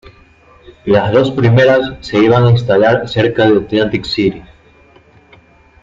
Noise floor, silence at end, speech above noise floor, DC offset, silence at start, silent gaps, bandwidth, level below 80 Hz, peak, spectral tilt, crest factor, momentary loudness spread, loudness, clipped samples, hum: -45 dBFS; 1.4 s; 34 dB; under 0.1%; 0.85 s; none; 7.6 kHz; -42 dBFS; 0 dBFS; -7.5 dB/octave; 12 dB; 7 LU; -12 LUFS; under 0.1%; none